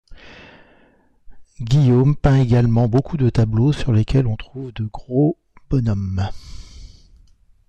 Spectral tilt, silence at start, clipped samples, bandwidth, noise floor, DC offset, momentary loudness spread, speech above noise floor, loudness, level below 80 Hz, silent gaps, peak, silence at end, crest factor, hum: -8.5 dB/octave; 0.1 s; under 0.1%; 8.4 kHz; -55 dBFS; under 0.1%; 13 LU; 38 dB; -18 LUFS; -34 dBFS; none; -6 dBFS; 0.85 s; 14 dB; none